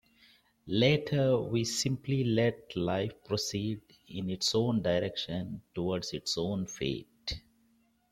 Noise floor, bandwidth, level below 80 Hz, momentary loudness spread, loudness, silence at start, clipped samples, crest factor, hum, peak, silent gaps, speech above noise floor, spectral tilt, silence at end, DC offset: -69 dBFS; 16.5 kHz; -58 dBFS; 12 LU; -32 LUFS; 0.65 s; under 0.1%; 20 dB; none; -12 dBFS; none; 38 dB; -5 dB/octave; 0.7 s; under 0.1%